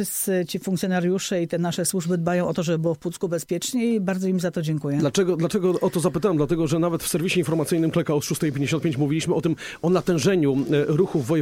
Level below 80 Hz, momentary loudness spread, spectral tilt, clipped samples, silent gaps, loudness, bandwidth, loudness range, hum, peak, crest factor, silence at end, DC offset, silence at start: -54 dBFS; 4 LU; -5.5 dB/octave; under 0.1%; none; -23 LUFS; 16.5 kHz; 2 LU; none; -8 dBFS; 14 dB; 0 s; under 0.1%; 0 s